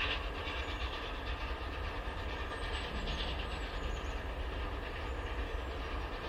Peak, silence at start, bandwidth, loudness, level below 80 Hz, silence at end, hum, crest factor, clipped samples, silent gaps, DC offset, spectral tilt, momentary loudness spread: -22 dBFS; 0 s; 13.5 kHz; -40 LUFS; -42 dBFS; 0 s; none; 16 dB; under 0.1%; none; under 0.1%; -5 dB/octave; 3 LU